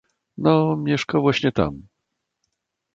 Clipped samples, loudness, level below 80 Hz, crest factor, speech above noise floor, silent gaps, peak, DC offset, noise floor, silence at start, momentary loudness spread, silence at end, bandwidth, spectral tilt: under 0.1%; -21 LUFS; -48 dBFS; 20 dB; 59 dB; none; -4 dBFS; under 0.1%; -79 dBFS; 0.4 s; 7 LU; 1.15 s; 7.8 kHz; -7 dB/octave